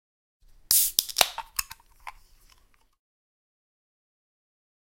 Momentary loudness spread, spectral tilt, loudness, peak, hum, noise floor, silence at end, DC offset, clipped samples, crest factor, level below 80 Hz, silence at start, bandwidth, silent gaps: 26 LU; 2 dB/octave; -23 LUFS; 0 dBFS; none; -61 dBFS; 2.9 s; under 0.1%; under 0.1%; 32 dB; -58 dBFS; 0.7 s; 17 kHz; none